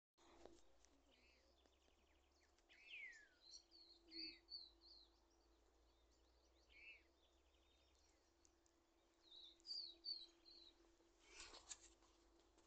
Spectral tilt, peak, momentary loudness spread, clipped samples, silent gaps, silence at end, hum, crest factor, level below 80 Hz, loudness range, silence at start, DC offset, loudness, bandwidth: -0.5 dB/octave; -38 dBFS; 16 LU; under 0.1%; none; 0 s; none; 26 dB; -82 dBFS; 8 LU; 0.15 s; under 0.1%; -58 LUFS; 8.4 kHz